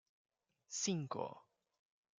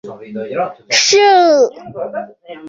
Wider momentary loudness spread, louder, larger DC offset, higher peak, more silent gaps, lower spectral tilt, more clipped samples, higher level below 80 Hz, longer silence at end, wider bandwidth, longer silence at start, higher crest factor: second, 11 LU vs 19 LU; second, -42 LUFS vs -12 LUFS; neither; second, -26 dBFS vs 0 dBFS; neither; first, -4 dB/octave vs -1.5 dB/octave; neither; second, -88 dBFS vs -64 dBFS; first, 0.8 s vs 0 s; first, 10 kHz vs 7.8 kHz; first, 0.7 s vs 0.05 s; first, 22 dB vs 14 dB